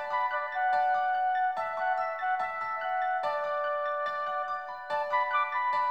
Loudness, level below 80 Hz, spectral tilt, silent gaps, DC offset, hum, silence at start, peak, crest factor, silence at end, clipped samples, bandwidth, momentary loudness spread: -30 LUFS; -76 dBFS; -2.5 dB/octave; none; 0.1%; none; 0 s; -16 dBFS; 14 dB; 0 s; under 0.1%; 7.8 kHz; 5 LU